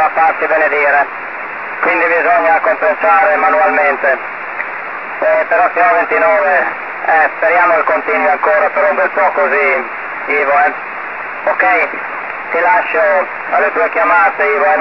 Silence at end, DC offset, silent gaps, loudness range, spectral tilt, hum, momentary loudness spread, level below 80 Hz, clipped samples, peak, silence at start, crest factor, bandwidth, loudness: 0 s; 0.6%; none; 2 LU; -5.5 dB/octave; none; 11 LU; -68 dBFS; under 0.1%; 0 dBFS; 0 s; 12 dB; 6 kHz; -12 LUFS